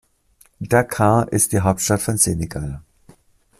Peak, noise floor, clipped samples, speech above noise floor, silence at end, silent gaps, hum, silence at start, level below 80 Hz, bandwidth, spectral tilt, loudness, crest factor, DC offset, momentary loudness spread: 0 dBFS; -56 dBFS; under 0.1%; 38 dB; 0.8 s; none; none; 0.6 s; -44 dBFS; 16 kHz; -5 dB/octave; -18 LUFS; 20 dB; under 0.1%; 14 LU